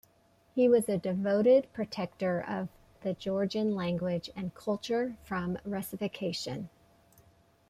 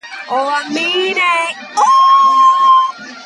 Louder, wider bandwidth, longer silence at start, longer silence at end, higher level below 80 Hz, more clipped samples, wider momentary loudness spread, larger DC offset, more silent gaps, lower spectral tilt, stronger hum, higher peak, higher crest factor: second, -31 LUFS vs -11 LUFS; first, 15.5 kHz vs 11.5 kHz; first, 0.55 s vs 0.05 s; first, 1 s vs 0 s; first, -64 dBFS vs -76 dBFS; neither; first, 13 LU vs 10 LU; neither; neither; first, -6 dB/octave vs -1 dB/octave; neither; second, -14 dBFS vs -2 dBFS; first, 18 dB vs 10 dB